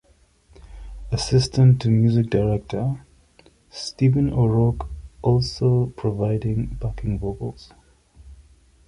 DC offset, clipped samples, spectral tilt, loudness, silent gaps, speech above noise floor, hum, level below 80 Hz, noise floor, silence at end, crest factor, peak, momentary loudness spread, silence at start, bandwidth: under 0.1%; under 0.1%; -7.5 dB/octave; -21 LUFS; none; 37 dB; none; -38 dBFS; -57 dBFS; 0.55 s; 16 dB; -6 dBFS; 16 LU; 0.65 s; 11 kHz